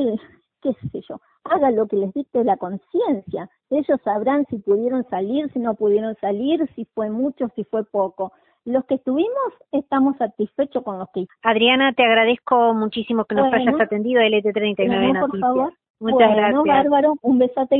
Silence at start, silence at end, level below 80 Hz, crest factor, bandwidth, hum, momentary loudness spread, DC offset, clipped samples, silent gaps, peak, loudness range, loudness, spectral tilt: 0 s; 0 s; -60 dBFS; 18 dB; 4.2 kHz; none; 12 LU; under 0.1%; under 0.1%; 15.90-15.94 s; -2 dBFS; 5 LU; -20 LUFS; -10.5 dB/octave